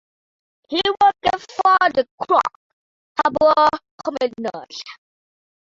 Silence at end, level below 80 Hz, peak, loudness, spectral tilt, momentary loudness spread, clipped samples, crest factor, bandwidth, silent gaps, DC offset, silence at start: 0.85 s; -58 dBFS; -2 dBFS; -19 LUFS; -3.5 dB/octave; 14 LU; under 0.1%; 18 dB; 7.8 kHz; 2.11-2.18 s, 2.56-3.15 s, 3.91-3.98 s; under 0.1%; 0.7 s